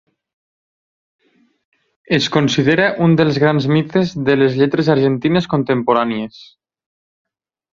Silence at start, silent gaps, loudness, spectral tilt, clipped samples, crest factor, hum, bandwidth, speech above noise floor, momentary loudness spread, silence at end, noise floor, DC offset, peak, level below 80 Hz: 2.1 s; none; -15 LUFS; -6.5 dB/octave; under 0.1%; 16 dB; none; 7.4 kHz; over 75 dB; 4 LU; 1.3 s; under -90 dBFS; under 0.1%; 0 dBFS; -54 dBFS